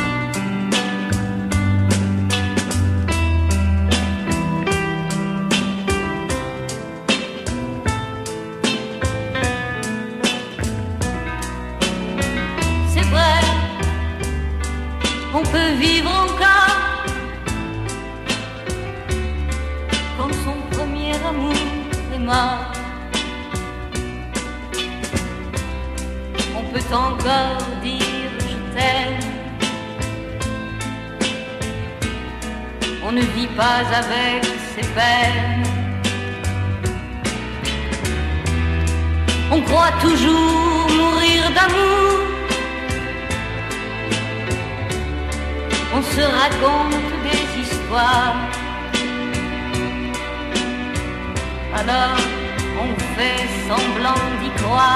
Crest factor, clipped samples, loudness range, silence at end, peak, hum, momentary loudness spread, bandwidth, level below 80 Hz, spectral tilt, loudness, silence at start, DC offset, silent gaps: 18 dB; under 0.1%; 7 LU; 0 s; -2 dBFS; none; 11 LU; 13.5 kHz; -30 dBFS; -4.5 dB/octave; -20 LUFS; 0 s; under 0.1%; none